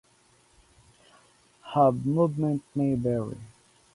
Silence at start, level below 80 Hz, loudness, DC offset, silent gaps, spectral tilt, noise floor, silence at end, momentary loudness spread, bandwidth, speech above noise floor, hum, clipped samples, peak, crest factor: 1.65 s; -60 dBFS; -26 LUFS; under 0.1%; none; -9 dB/octave; -62 dBFS; 0.45 s; 9 LU; 11.5 kHz; 37 dB; none; under 0.1%; -10 dBFS; 20 dB